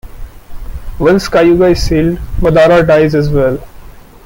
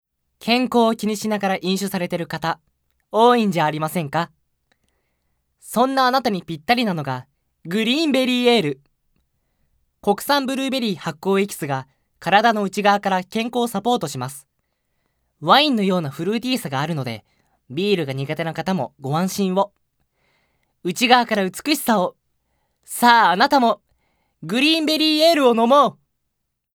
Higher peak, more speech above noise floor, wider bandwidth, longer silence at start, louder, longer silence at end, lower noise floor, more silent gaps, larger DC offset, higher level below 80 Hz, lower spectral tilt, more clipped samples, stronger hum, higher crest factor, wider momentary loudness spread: about the same, 0 dBFS vs 0 dBFS; second, 24 dB vs 57 dB; second, 16.5 kHz vs over 20 kHz; second, 0.05 s vs 0.45 s; first, -10 LUFS vs -19 LUFS; second, 0.25 s vs 0.85 s; second, -32 dBFS vs -76 dBFS; neither; neither; first, -24 dBFS vs -64 dBFS; first, -7 dB/octave vs -4.5 dB/octave; neither; neither; second, 10 dB vs 20 dB; about the same, 15 LU vs 13 LU